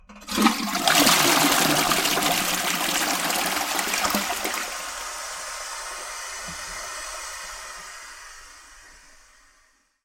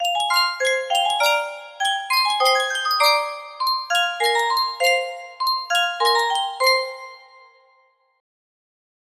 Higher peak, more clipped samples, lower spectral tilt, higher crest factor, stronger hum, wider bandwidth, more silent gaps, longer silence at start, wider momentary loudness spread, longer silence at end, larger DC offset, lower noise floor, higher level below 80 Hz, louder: first, -2 dBFS vs -6 dBFS; neither; first, -1.5 dB/octave vs 3.5 dB/octave; first, 24 dB vs 16 dB; neither; about the same, 17 kHz vs 16 kHz; neither; about the same, 0.1 s vs 0 s; first, 18 LU vs 8 LU; second, 1.1 s vs 2 s; neither; about the same, -62 dBFS vs -61 dBFS; first, -52 dBFS vs -76 dBFS; second, -22 LUFS vs -19 LUFS